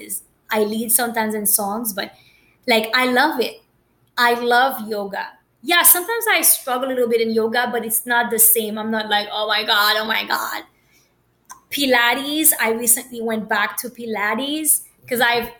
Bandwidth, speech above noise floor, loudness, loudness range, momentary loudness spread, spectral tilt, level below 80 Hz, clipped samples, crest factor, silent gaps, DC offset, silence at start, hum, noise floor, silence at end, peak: 17.5 kHz; 42 dB; -17 LUFS; 3 LU; 15 LU; -1 dB/octave; -64 dBFS; under 0.1%; 18 dB; none; under 0.1%; 0 s; none; -61 dBFS; 0.05 s; -2 dBFS